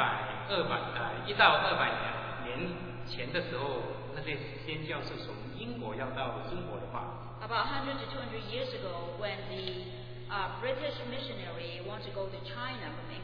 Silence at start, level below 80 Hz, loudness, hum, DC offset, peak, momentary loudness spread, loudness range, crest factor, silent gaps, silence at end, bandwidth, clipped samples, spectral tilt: 0 s; -54 dBFS; -35 LUFS; none; under 0.1%; -8 dBFS; 10 LU; 8 LU; 26 dB; none; 0 s; 5.4 kHz; under 0.1%; -7 dB/octave